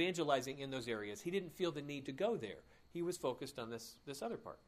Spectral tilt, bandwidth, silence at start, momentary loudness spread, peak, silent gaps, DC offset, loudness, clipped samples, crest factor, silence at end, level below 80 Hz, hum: -4.5 dB/octave; 15.5 kHz; 0 s; 12 LU; -20 dBFS; none; under 0.1%; -42 LUFS; under 0.1%; 20 dB; 0.1 s; -74 dBFS; none